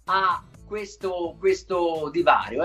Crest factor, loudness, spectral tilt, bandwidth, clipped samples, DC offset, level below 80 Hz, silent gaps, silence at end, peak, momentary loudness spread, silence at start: 20 dB; -24 LUFS; -4.5 dB/octave; 12 kHz; under 0.1%; under 0.1%; -52 dBFS; none; 0 s; -6 dBFS; 13 LU; 0.05 s